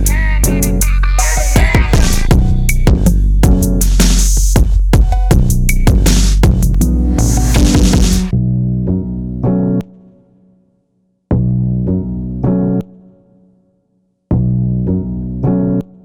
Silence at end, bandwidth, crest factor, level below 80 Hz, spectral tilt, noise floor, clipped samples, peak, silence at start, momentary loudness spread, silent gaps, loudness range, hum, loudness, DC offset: 0.2 s; 17.5 kHz; 12 dB; -14 dBFS; -5.5 dB/octave; -61 dBFS; under 0.1%; 0 dBFS; 0 s; 7 LU; none; 6 LU; none; -13 LUFS; under 0.1%